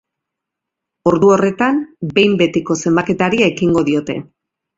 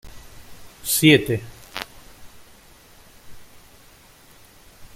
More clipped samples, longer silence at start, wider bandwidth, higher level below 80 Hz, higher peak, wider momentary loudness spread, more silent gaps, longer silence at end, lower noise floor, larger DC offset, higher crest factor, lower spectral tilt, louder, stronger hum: neither; first, 1.05 s vs 0.05 s; second, 7.8 kHz vs 16.5 kHz; about the same, -50 dBFS vs -50 dBFS; about the same, 0 dBFS vs -2 dBFS; second, 7 LU vs 21 LU; neither; first, 0.55 s vs 0.1 s; first, -81 dBFS vs -50 dBFS; neither; second, 16 dB vs 24 dB; first, -5.5 dB/octave vs -4 dB/octave; first, -15 LUFS vs -19 LUFS; neither